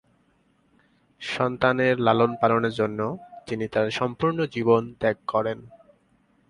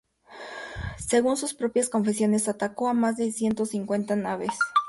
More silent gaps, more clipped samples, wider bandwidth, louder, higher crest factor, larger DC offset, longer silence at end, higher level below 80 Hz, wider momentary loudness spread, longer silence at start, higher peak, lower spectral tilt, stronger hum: neither; neither; about the same, 11 kHz vs 11.5 kHz; about the same, -24 LUFS vs -26 LUFS; about the same, 20 dB vs 16 dB; neither; first, 0.75 s vs 0 s; second, -58 dBFS vs -52 dBFS; about the same, 11 LU vs 12 LU; first, 1.2 s vs 0.3 s; first, -4 dBFS vs -10 dBFS; first, -6.5 dB/octave vs -4.5 dB/octave; neither